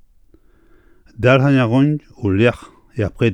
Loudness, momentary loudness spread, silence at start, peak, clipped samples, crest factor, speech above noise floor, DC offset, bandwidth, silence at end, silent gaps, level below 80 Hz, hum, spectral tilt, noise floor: -16 LUFS; 11 LU; 1.2 s; 0 dBFS; under 0.1%; 16 dB; 35 dB; under 0.1%; 9.2 kHz; 0 s; none; -46 dBFS; none; -8 dB/octave; -50 dBFS